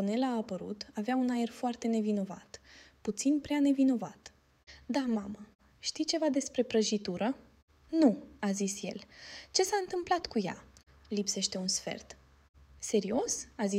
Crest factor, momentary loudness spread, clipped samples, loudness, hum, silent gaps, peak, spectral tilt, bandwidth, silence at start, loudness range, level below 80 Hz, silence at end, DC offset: 20 dB; 16 LU; under 0.1%; -32 LUFS; none; 5.55-5.59 s, 7.62-7.68 s, 12.49-12.54 s; -12 dBFS; -4 dB/octave; 16 kHz; 0 s; 3 LU; -66 dBFS; 0 s; under 0.1%